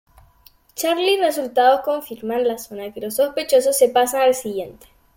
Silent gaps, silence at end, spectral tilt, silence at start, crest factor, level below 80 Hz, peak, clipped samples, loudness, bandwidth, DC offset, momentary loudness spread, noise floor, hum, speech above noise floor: none; 0.45 s; -2 dB/octave; 0.75 s; 16 dB; -58 dBFS; -4 dBFS; under 0.1%; -19 LUFS; 17 kHz; under 0.1%; 14 LU; -53 dBFS; none; 34 dB